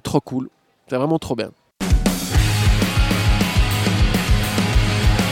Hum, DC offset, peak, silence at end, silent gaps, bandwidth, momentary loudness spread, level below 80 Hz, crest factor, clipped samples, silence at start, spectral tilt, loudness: none; under 0.1%; -2 dBFS; 0 s; none; 17 kHz; 10 LU; -22 dBFS; 16 dB; under 0.1%; 0.05 s; -5 dB/octave; -19 LUFS